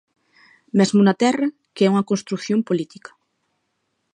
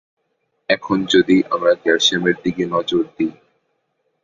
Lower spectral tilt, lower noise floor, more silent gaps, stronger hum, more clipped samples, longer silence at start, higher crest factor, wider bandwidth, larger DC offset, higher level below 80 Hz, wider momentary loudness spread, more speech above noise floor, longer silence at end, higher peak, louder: first, -6 dB/octave vs -4 dB/octave; about the same, -73 dBFS vs -70 dBFS; neither; neither; neither; about the same, 0.75 s vs 0.7 s; about the same, 18 dB vs 18 dB; first, 9.8 kHz vs 7.8 kHz; neither; second, -72 dBFS vs -56 dBFS; about the same, 9 LU vs 9 LU; about the same, 54 dB vs 53 dB; first, 1.3 s vs 0.9 s; about the same, -4 dBFS vs -2 dBFS; second, -20 LUFS vs -17 LUFS